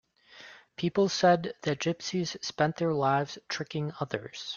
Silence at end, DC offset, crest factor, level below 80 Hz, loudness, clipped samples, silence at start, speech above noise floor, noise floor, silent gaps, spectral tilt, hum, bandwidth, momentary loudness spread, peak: 0 s; under 0.1%; 20 dB; -68 dBFS; -29 LUFS; under 0.1%; 0.35 s; 23 dB; -53 dBFS; none; -5 dB/octave; none; 7.2 kHz; 12 LU; -10 dBFS